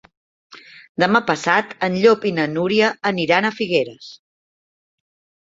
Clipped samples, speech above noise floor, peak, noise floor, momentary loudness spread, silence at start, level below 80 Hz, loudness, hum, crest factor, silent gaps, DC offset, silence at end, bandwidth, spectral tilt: under 0.1%; over 72 dB; 0 dBFS; under -90 dBFS; 7 LU; 0.55 s; -64 dBFS; -18 LUFS; none; 20 dB; 0.89-0.95 s; under 0.1%; 1.25 s; 7.8 kHz; -5 dB/octave